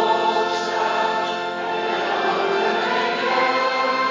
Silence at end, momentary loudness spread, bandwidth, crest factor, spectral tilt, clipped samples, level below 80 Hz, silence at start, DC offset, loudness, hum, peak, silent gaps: 0 s; 4 LU; 7.6 kHz; 14 dB; -3.5 dB/octave; under 0.1%; -68 dBFS; 0 s; under 0.1%; -21 LUFS; none; -6 dBFS; none